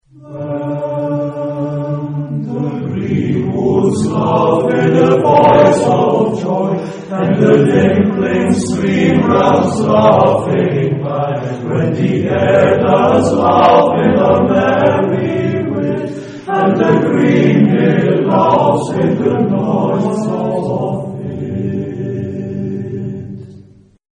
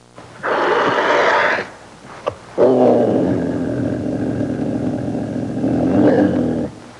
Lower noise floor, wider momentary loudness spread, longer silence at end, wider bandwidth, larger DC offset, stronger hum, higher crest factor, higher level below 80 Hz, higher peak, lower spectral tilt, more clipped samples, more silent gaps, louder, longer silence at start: first, -41 dBFS vs -37 dBFS; about the same, 12 LU vs 12 LU; first, 0.6 s vs 0 s; about the same, 10 kHz vs 11 kHz; neither; neither; about the same, 12 dB vs 14 dB; about the same, -46 dBFS vs -50 dBFS; about the same, 0 dBFS vs -2 dBFS; about the same, -7.5 dB/octave vs -7 dB/octave; neither; neither; first, -13 LUFS vs -17 LUFS; about the same, 0.25 s vs 0.15 s